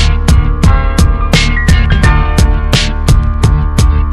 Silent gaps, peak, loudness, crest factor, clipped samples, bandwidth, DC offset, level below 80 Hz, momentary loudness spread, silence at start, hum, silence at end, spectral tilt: none; 0 dBFS; -10 LUFS; 8 dB; 1%; 13.5 kHz; under 0.1%; -10 dBFS; 2 LU; 0 s; none; 0 s; -5 dB/octave